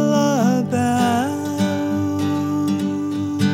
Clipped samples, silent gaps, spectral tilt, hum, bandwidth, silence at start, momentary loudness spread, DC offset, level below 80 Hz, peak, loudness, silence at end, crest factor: under 0.1%; none; -6 dB/octave; none; 16 kHz; 0 s; 6 LU; under 0.1%; -64 dBFS; -4 dBFS; -20 LUFS; 0 s; 14 dB